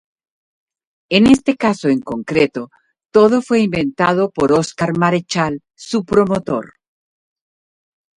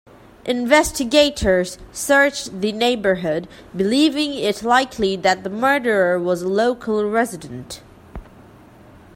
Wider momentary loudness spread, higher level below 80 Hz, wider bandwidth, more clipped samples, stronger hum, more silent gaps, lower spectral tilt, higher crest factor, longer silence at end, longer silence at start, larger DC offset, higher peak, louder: about the same, 10 LU vs 12 LU; second, -50 dBFS vs -44 dBFS; second, 11.5 kHz vs 16.5 kHz; neither; neither; neither; first, -6 dB/octave vs -4 dB/octave; about the same, 16 dB vs 18 dB; first, 1.55 s vs 0.9 s; first, 1.1 s vs 0.45 s; neither; about the same, 0 dBFS vs 0 dBFS; about the same, -16 LUFS vs -18 LUFS